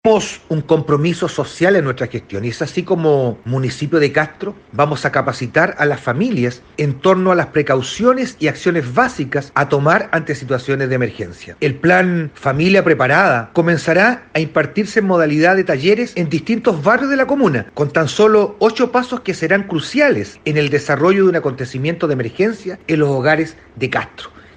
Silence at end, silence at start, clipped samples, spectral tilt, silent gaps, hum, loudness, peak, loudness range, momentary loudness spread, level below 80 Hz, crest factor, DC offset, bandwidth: 0.3 s; 0.05 s; under 0.1%; -6 dB/octave; none; none; -16 LUFS; 0 dBFS; 3 LU; 9 LU; -52 dBFS; 16 dB; under 0.1%; 9.6 kHz